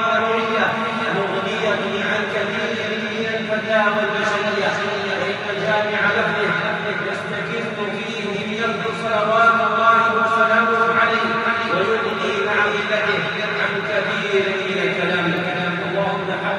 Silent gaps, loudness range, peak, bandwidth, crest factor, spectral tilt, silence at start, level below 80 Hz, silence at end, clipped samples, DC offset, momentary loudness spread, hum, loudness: none; 4 LU; -2 dBFS; 11 kHz; 16 dB; -5 dB/octave; 0 s; -64 dBFS; 0 s; under 0.1%; under 0.1%; 7 LU; none; -19 LUFS